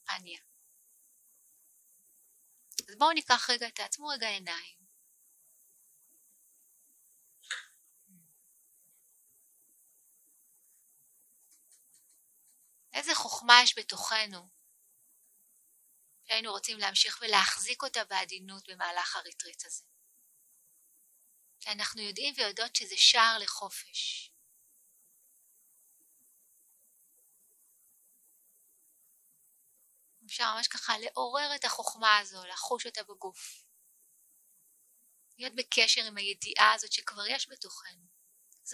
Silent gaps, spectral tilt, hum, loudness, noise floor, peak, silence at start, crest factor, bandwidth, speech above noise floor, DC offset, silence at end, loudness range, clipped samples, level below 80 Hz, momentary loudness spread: none; 1 dB/octave; none; -29 LUFS; -67 dBFS; -2 dBFS; 0.1 s; 32 dB; 16 kHz; 36 dB; under 0.1%; 0 s; 22 LU; under 0.1%; -86 dBFS; 19 LU